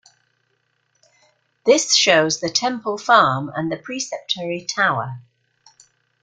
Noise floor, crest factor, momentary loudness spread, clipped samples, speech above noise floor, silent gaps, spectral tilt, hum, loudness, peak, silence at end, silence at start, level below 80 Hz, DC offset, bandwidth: -68 dBFS; 20 dB; 13 LU; under 0.1%; 49 dB; none; -2.5 dB/octave; none; -18 LUFS; -2 dBFS; 1 s; 1.65 s; -64 dBFS; under 0.1%; 10.5 kHz